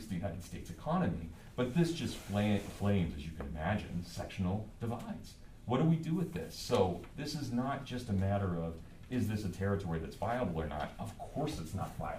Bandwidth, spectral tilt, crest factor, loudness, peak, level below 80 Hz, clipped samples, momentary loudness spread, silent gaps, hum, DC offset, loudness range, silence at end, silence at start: 15.5 kHz; -6.5 dB/octave; 18 dB; -37 LUFS; -18 dBFS; -52 dBFS; under 0.1%; 11 LU; none; none; under 0.1%; 3 LU; 0 s; 0 s